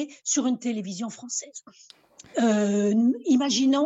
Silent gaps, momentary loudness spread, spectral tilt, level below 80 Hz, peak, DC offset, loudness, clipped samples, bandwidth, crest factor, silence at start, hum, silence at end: none; 12 LU; -4 dB/octave; -72 dBFS; -12 dBFS; under 0.1%; -25 LUFS; under 0.1%; 8.2 kHz; 14 dB; 0 s; none; 0 s